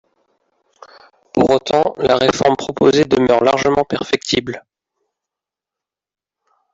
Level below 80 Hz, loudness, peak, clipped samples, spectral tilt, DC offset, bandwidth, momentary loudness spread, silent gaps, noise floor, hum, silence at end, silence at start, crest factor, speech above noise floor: -50 dBFS; -15 LUFS; -2 dBFS; under 0.1%; -5 dB/octave; under 0.1%; 7.8 kHz; 6 LU; none; -86 dBFS; none; 2.15 s; 1.35 s; 16 dB; 72 dB